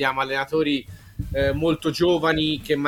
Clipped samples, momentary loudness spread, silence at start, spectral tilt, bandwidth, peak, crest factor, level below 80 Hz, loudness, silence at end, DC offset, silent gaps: under 0.1%; 9 LU; 0 s; -5.5 dB/octave; 17 kHz; -6 dBFS; 16 dB; -40 dBFS; -22 LUFS; 0 s; under 0.1%; none